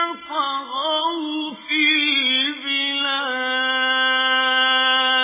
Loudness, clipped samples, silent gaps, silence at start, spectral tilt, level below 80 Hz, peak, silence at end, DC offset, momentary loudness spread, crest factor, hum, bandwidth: -18 LUFS; under 0.1%; none; 0 s; 4 dB/octave; -70 dBFS; -6 dBFS; 0 s; under 0.1%; 8 LU; 14 dB; none; 3.9 kHz